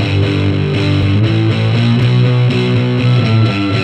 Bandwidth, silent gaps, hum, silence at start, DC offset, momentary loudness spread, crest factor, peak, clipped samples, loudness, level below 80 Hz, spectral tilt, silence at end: 8.6 kHz; none; none; 0 s; under 0.1%; 2 LU; 10 dB; -2 dBFS; under 0.1%; -12 LUFS; -40 dBFS; -7.5 dB/octave; 0 s